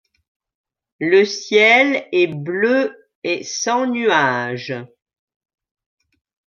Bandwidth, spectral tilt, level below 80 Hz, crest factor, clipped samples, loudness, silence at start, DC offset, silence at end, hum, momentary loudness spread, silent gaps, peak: 7.4 kHz; -3.5 dB/octave; -72 dBFS; 18 dB; under 0.1%; -17 LUFS; 1 s; under 0.1%; 1.65 s; none; 14 LU; 3.15-3.22 s; -2 dBFS